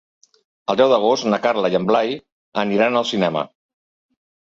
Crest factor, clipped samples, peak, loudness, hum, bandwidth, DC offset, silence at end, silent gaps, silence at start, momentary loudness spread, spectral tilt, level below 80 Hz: 18 dB; under 0.1%; -2 dBFS; -19 LUFS; none; 7.8 kHz; under 0.1%; 1.05 s; 2.32-2.52 s; 0.7 s; 13 LU; -5 dB/octave; -62 dBFS